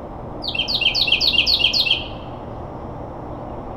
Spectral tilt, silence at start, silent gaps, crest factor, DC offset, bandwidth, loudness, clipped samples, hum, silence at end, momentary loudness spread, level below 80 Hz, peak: -3 dB/octave; 0 s; none; 18 dB; under 0.1%; 19.5 kHz; -16 LUFS; under 0.1%; none; 0 s; 18 LU; -40 dBFS; -4 dBFS